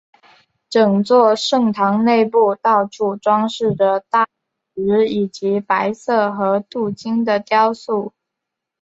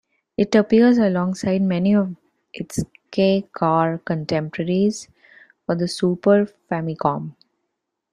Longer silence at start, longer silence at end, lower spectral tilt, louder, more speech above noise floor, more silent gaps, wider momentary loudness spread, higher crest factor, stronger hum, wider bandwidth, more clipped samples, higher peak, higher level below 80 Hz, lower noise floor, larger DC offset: first, 0.7 s vs 0.4 s; about the same, 0.75 s vs 0.8 s; about the same, -6 dB/octave vs -6.5 dB/octave; first, -17 LUFS vs -20 LUFS; first, 65 dB vs 59 dB; neither; second, 9 LU vs 13 LU; about the same, 16 dB vs 18 dB; neither; second, 8 kHz vs 13 kHz; neither; about the same, -2 dBFS vs -4 dBFS; second, -62 dBFS vs -56 dBFS; about the same, -81 dBFS vs -78 dBFS; neither